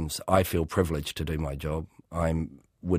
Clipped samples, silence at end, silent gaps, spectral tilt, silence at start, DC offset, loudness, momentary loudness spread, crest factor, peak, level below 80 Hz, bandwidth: under 0.1%; 0 s; none; -6 dB/octave; 0 s; under 0.1%; -29 LUFS; 12 LU; 22 dB; -6 dBFS; -40 dBFS; 15.5 kHz